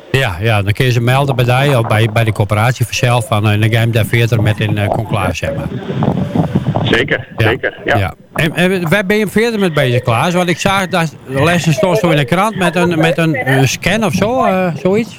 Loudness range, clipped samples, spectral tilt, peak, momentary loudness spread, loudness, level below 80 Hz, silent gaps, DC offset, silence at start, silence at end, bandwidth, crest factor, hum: 3 LU; under 0.1%; -6 dB/octave; 0 dBFS; 4 LU; -13 LUFS; -38 dBFS; none; under 0.1%; 0.05 s; 0 s; 16.5 kHz; 12 dB; none